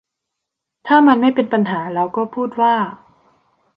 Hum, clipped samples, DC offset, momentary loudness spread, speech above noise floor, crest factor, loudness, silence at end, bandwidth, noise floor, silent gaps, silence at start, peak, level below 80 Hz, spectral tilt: none; under 0.1%; under 0.1%; 10 LU; 65 dB; 16 dB; -16 LUFS; 0.8 s; 5.4 kHz; -80 dBFS; none; 0.85 s; -2 dBFS; -64 dBFS; -8.5 dB/octave